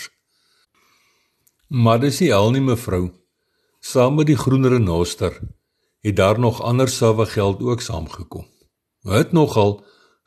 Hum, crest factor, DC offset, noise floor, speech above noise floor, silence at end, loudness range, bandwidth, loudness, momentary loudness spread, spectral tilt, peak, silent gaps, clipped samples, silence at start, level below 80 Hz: none; 18 dB; under 0.1%; -69 dBFS; 51 dB; 0.5 s; 2 LU; 13 kHz; -18 LUFS; 18 LU; -6.5 dB/octave; -2 dBFS; none; under 0.1%; 0 s; -44 dBFS